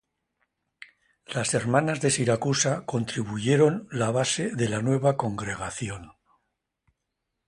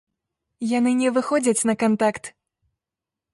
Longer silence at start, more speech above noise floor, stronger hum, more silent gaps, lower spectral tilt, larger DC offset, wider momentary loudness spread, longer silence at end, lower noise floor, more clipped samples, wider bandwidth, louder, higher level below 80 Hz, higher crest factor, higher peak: first, 1.3 s vs 0.6 s; second, 57 dB vs 67 dB; neither; neither; about the same, -4.5 dB/octave vs -4.5 dB/octave; neither; about the same, 10 LU vs 12 LU; first, 1.35 s vs 1.05 s; second, -82 dBFS vs -88 dBFS; neither; about the same, 11.5 kHz vs 11.5 kHz; second, -26 LUFS vs -21 LUFS; first, -58 dBFS vs -66 dBFS; about the same, 20 dB vs 16 dB; about the same, -6 dBFS vs -8 dBFS